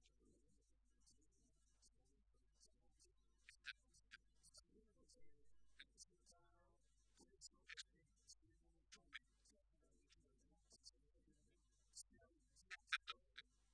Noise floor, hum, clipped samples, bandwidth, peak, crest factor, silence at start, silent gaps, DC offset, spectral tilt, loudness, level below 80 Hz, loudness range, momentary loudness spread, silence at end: -81 dBFS; none; under 0.1%; 9.6 kHz; -26 dBFS; 38 dB; 0 s; none; under 0.1%; 0 dB/octave; -57 LUFS; -82 dBFS; 12 LU; 20 LU; 0 s